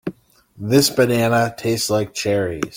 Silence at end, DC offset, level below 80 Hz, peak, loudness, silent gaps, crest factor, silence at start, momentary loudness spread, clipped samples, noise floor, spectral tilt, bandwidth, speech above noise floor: 0 s; under 0.1%; -52 dBFS; -2 dBFS; -18 LUFS; none; 16 dB; 0.05 s; 6 LU; under 0.1%; -48 dBFS; -4.5 dB/octave; 17 kHz; 30 dB